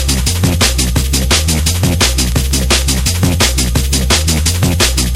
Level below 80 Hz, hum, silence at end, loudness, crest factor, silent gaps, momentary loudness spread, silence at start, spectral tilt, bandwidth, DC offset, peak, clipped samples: -16 dBFS; none; 0 s; -12 LUFS; 12 dB; none; 3 LU; 0 s; -3.5 dB/octave; 17 kHz; under 0.1%; 0 dBFS; under 0.1%